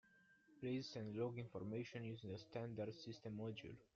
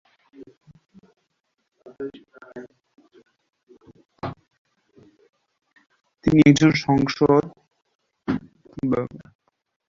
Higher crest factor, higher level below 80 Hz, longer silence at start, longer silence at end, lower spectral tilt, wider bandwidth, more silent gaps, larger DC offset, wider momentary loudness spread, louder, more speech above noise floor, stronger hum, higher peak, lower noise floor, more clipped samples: second, 16 dB vs 22 dB; second, -80 dBFS vs -52 dBFS; second, 0.05 s vs 0.4 s; second, 0.1 s vs 0.7 s; about the same, -6 dB/octave vs -6.5 dB/octave; about the same, 7.4 kHz vs 7.6 kHz; second, none vs 0.57-0.61 s, 3.63-3.67 s, 4.58-4.65 s, 5.29-5.33 s, 7.95-7.99 s; neither; second, 6 LU vs 27 LU; second, -50 LUFS vs -19 LUFS; second, 24 dB vs 57 dB; neither; second, -34 dBFS vs -2 dBFS; about the same, -73 dBFS vs -75 dBFS; neither